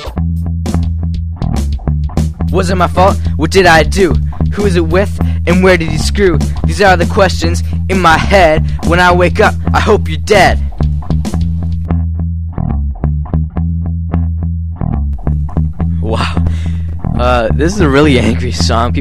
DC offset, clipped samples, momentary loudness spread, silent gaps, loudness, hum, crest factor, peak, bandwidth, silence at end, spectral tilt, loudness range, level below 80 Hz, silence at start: under 0.1%; 0.4%; 9 LU; none; -12 LUFS; none; 12 dB; 0 dBFS; 14 kHz; 0 s; -6 dB/octave; 7 LU; -18 dBFS; 0 s